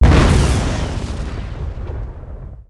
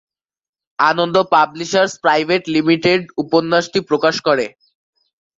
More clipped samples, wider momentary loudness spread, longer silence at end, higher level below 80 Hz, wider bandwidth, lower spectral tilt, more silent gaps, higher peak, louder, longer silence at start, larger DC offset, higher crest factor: neither; first, 19 LU vs 5 LU; second, 0.05 s vs 0.9 s; first, -20 dBFS vs -60 dBFS; first, 11.5 kHz vs 7.8 kHz; first, -6 dB/octave vs -4.5 dB/octave; neither; about the same, -2 dBFS vs 0 dBFS; second, -19 LUFS vs -16 LUFS; second, 0 s vs 0.8 s; neither; about the same, 14 dB vs 16 dB